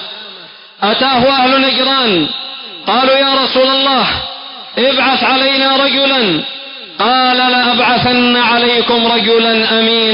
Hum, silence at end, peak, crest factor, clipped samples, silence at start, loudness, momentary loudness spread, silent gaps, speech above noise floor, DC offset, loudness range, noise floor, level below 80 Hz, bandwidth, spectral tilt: none; 0 s; -2 dBFS; 10 dB; under 0.1%; 0 s; -10 LUFS; 12 LU; none; 24 dB; under 0.1%; 2 LU; -34 dBFS; -46 dBFS; 5.4 kHz; -8.5 dB/octave